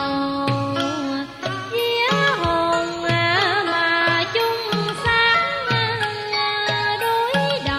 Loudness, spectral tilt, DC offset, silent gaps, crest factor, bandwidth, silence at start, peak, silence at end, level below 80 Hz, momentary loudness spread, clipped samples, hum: -20 LUFS; -4.5 dB/octave; under 0.1%; none; 14 dB; 15 kHz; 0 s; -6 dBFS; 0 s; -48 dBFS; 6 LU; under 0.1%; none